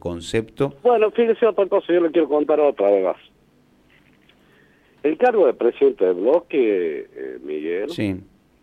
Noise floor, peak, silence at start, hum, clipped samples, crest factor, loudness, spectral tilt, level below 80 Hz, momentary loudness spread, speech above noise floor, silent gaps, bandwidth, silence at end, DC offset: -57 dBFS; -6 dBFS; 0.05 s; none; under 0.1%; 14 dB; -20 LUFS; -6.5 dB/octave; -56 dBFS; 10 LU; 38 dB; none; 9.8 kHz; 0.4 s; under 0.1%